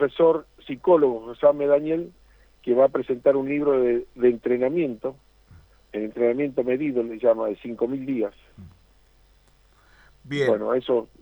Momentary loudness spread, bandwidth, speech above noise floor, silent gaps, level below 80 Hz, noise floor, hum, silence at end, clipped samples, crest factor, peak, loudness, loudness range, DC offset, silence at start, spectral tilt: 12 LU; 19.5 kHz; 35 dB; none; -58 dBFS; -58 dBFS; none; 0.15 s; under 0.1%; 18 dB; -6 dBFS; -23 LUFS; 7 LU; under 0.1%; 0 s; -8 dB/octave